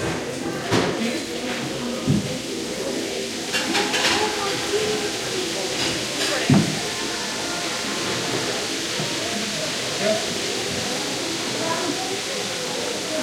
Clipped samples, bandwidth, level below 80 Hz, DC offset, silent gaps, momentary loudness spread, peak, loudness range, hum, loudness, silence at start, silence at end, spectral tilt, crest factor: under 0.1%; 16.5 kHz; -54 dBFS; under 0.1%; none; 7 LU; -4 dBFS; 2 LU; none; -23 LUFS; 0 s; 0 s; -3 dB/octave; 20 dB